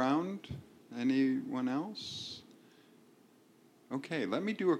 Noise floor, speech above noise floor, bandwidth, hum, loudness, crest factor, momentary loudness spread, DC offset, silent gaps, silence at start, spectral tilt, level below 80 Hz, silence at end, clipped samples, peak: -64 dBFS; 29 dB; 11 kHz; none; -36 LUFS; 18 dB; 16 LU; under 0.1%; none; 0 s; -6 dB/octave; -72 dBFS; 0 s; under 0.1%; -18 dBFS